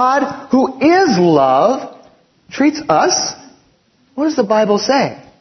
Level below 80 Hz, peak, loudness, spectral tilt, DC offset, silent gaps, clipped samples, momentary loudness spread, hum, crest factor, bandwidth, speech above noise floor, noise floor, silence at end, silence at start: -58 dBFS; 0 dBFS; -14 LUFS; -4.5 dB/octave; under 0.1%; none; under 0.1%; 11 LU; none; 14 dB; 6.4 kHz; 42 dB; -55 dBFS; 0.2 s; 0 s